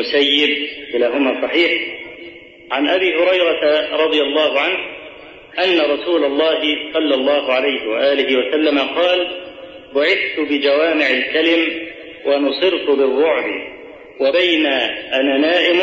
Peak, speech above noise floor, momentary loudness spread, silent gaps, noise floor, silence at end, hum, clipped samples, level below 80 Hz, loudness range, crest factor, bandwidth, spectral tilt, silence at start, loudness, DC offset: -2 dBFS; 21 dB; 12 LU; none; -37 dBFS; 0 s; none; under 0.1%; -58 dBFS; 1 LU; 14 dB; 7.6 kHz; -4 dB/octave; 0 s; -16 LUFS; under 0.1%